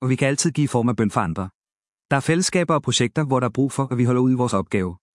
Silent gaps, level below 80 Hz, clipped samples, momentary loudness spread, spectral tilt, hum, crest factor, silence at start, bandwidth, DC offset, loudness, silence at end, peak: 1.55-1.61 s, 1.72-1.76 s, 1.88-1.92 s, 2.05-2.09 s; -56 dBFS; under 0.1%; 6 LU; -5 dB/octave; none; 18 dB; 0 s; 12 kHz; under 0.1%; -21 LUFS; 0.2 s; -2 dBFS